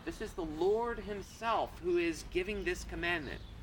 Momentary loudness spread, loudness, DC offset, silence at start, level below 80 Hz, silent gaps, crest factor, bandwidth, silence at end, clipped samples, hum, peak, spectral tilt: 9 LU; -36 LUFS; under 0.1%; 0 s; -50 dBFS; none; 14 dB; 19 kHz; 0 s; under 0.1%; none; -22 dBFS; -5 dB/octave